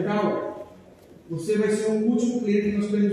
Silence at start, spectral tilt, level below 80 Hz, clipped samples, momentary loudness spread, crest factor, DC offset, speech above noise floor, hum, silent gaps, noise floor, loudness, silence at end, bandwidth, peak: 0 s; -6.5 dB/octave; -60 dBFS; under 0.1%; 13 LU; 14 dB; under 0.1%; 26 dB; none; none; -49 dBFS; -24 LUFS; 0 s; 11.5 kHz; -10 dBFS